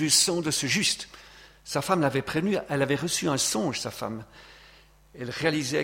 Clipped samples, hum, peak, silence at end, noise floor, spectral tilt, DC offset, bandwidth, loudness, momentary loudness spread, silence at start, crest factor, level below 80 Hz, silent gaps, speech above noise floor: under 0.1%; none; -8 dBFS; 0 s; -55 dBFS; -3 dB/octave; under 0.1%; 16.5 kHz; -26 LUFS; 13 LU; 0 s; 20 dB; -58 dBFS; none; 28 dB